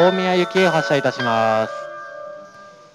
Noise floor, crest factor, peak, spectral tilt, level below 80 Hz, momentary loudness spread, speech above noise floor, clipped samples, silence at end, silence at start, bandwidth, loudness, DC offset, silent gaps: -43 dBFS; 16 dB; -2 dBFS; -5.5 dB/octave; -68 dBFS; 18 LU; 25 dB; under 0.1%; 0.25 s; 0 s; 12.5 kHz; -18 LUFS; under 0.1%; none